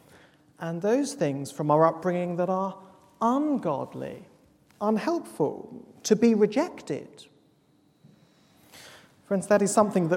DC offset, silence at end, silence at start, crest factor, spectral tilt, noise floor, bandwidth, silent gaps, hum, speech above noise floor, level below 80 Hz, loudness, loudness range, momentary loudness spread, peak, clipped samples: under 0.1%; 0 s; 0.6 s; 22 dB; -6 dB/octave; -64 dBFS; 16.5 kHz; none; none; 38 dB; -72 dBFS; -26 LUFS; 3 LU; 17 LU; -6 dBFS; under 0.1%